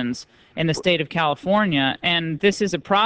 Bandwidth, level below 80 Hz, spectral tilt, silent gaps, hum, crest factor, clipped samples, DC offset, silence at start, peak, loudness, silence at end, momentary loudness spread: 8 kHz; -54 dBFS; -5 dB/octave; none; none; 16 dB; under 0.1%; under 0.1%; 0 s; -4 dBFS; -21 LUFS; 0 s; 7 LU